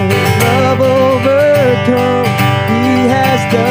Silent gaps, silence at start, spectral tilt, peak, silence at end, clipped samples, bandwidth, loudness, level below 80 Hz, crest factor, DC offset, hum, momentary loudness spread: none; 0 s; -6 dB/octave; 0 dBFS; 0 s; under 0.1%; 16 kHz; -11 LUFS; -44 dBFS; 10 dB; under 0.1%; none; 2 LU